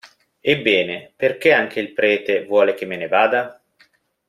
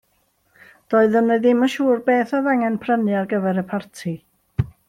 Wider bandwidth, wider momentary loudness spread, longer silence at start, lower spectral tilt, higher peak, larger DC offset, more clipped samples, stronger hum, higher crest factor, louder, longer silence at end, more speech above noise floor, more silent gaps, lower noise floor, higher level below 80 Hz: about the same, 14 kHz vs 14.5 kHz; second, 9 LU vs 13 LU; second, 0.05 s vs 0.9 s; second, -5.5 dB/octave vs -7 dB/octave; first, 0 dBFS vs -4 dBFS; neither; neither; neither; about the same, 20 dB vs 16 dB; about the same, -18 LUFS vs -20 LUFS; first, 0.75 s vs 0.2 s; second, 40 dB vs 46 dB; neither; second, -58 dBFS vs -65 dBFS; second, -64 dBFS vs -50 dBFS